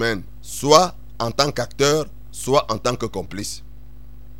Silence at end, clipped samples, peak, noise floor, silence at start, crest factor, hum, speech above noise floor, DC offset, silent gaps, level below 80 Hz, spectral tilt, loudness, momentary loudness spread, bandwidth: 0 s; under 0.1%; 0 dBFS; -42 dBFS; 0 s; 22 dB; none; 21 dB; 2%; none; -42 dBFS; -3.5 dB/octave; -20 LUFS; 16 LU; 16.5 kHz